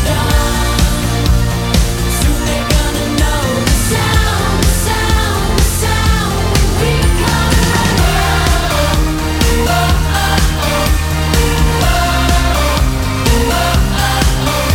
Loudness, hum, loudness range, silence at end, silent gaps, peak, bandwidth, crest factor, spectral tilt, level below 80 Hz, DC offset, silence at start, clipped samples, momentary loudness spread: -13 LUFS; none; 1 LU; 0 s; none; 0 dBFS; 17 kHz; 12 dB; -4.5 dB/octave; -16 dBFS; under 0.1%; 0 s; under 0.1%; 2 LU